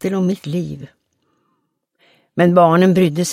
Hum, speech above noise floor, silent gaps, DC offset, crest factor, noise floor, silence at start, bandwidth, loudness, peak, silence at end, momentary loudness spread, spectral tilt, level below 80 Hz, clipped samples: none; 54 dB; none; under 0.1%; 16 dB; -69 dBFS; 0 s; 14.5 kHz; -15 LUFS; 0 dBFS; 0 s; 17 LU; -6.5 dB/octave; -58 dBFS; under 0.1%